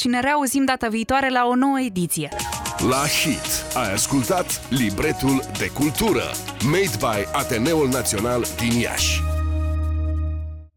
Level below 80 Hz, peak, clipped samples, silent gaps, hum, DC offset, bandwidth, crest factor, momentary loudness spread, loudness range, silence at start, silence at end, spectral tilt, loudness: -32 dBFS; -6 dBFS; under 0.1%; none; none; under 0.1%; 20 kHz; 16 dB; 5 LU; 1 LU; 0 s; 0.1 s; -4 dB/octave; -21 LUFS